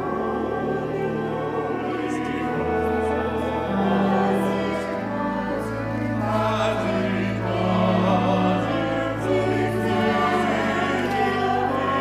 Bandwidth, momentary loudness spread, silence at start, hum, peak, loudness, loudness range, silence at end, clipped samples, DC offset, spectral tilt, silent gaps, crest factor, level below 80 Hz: 14.5 kHz; 6 LU; 0 s; none; -8 dBFS; -23 LUFS; 3 LU; 0 s; under 0.1%; under 0.1%; -7 dB/octave; none; 14 dB; -46 dBFS